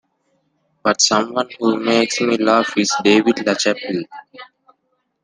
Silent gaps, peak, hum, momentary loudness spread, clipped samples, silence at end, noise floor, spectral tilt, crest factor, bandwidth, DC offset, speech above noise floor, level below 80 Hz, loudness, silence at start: none; -2 dBFS; none; 10 LU; under 0.1%; 0.8 s; -69 dBFS; -3 dB/octave; 18 dB; 10 kHz; under 0.1%; 52 dB; -64 dBFS; -17 LUFS; 0.85 s